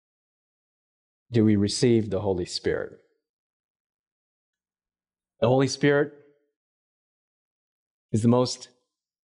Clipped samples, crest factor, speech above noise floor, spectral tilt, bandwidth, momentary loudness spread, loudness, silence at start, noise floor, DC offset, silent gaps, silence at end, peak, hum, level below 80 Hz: under 0.1%; 18 dB; over 67 dB; -6 dB/octave; 11 kHz; 9 LU; -24 LUFS; 1.3 s; under -90 dBFS; under 0.1%; 3.29-4.53 s, 6.56-8.09 s; 0.6 s; -10 dBFS; none; -60 dBFS